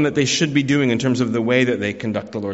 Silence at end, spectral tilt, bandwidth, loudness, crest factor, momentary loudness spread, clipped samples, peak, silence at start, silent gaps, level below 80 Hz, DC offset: 0 s; -4.5 dB/octave; 8 kHz; -19 LUFS; 16 dB; 7 LU; under 0.1%; -4 dBFS; 0 s; none; -56 dBFS; under 0.1%